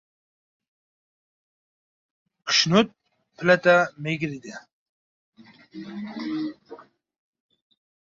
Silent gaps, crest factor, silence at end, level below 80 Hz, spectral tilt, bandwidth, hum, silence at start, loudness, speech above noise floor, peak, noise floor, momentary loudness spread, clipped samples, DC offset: 4.72-5.33 s; 24 dB; 1.2 s; -68 dBFS; -4 dB/octave; 7.6 kHz; none; 2.45 s; -22 LUFS; 24 dB; -4 dBFS; -47 dBFS; 23 LU; under 0.1%; under 0.1%